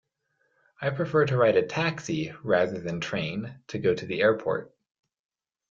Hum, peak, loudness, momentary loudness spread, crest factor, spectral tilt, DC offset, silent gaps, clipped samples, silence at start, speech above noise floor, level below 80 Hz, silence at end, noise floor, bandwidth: none; -10 dBFS; -27 LUFS; 10 LU; 18 dB; -6 dB/octave; under 0.1%; none; under 0.1%; 0.8 s; 48 dB; -64 dBFS; 1.05 s; -74 dBFS; 7.6 kHz